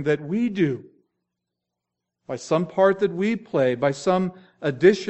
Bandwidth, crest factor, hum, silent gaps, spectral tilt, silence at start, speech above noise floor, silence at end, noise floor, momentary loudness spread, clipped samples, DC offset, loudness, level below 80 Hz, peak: 8.2 kHz; 22 dB; 60 Hz at -55 dBFS; none; -6.5 dB/octave; 0 s; 62 dB; 0 s; -84 dBFS; 11 LU; under 0.1%; under 0.1%; -23 LUFS; -66 dBFS; -2 dBFS